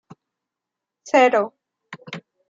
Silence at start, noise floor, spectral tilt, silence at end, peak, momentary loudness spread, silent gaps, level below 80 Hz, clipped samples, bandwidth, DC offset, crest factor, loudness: 1.05 s; -85 dBFS; -4 dB/octave; 0.3 s; -4 dBFS; 21 LU; none; -80 dBFS; under 0.1%; 7.6 kHz; under 0.1%; 20 dB; -18 LUFS